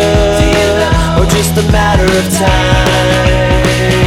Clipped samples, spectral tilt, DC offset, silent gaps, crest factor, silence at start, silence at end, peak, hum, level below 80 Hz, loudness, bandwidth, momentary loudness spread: under 0.1%; -5 dB/octave; under 0.1%; none; 8 dB; 0 s; 0 s; 0 dBFS; none; -16 dBFS; -10 LUFS; 17 kHz; 1 LU